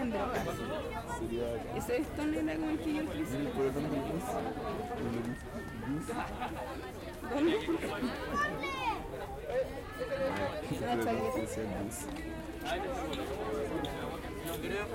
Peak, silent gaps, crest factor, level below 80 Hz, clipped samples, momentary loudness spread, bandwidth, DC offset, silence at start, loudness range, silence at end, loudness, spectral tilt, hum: -20 dBFS; none; 16 dB; -50 dBFS; under 0.1%; 7 LU; 16.5 kHz; under 0.1%; 0 s; 3 LU; 0 s; -36 LUFS; -5.5 dB/octave; none